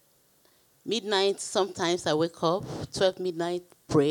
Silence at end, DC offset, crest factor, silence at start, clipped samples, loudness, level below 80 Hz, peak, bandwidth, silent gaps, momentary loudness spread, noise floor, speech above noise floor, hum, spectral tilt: 0 s; under 0.1%; 18 dB; 0.85 s; under 0.1%; -28 LUFS; -62 dBFS; -10 dBFS; 19 kHz; none; 7 LU; -64 dBFS; 37 dB; none; -4.5 dB/octave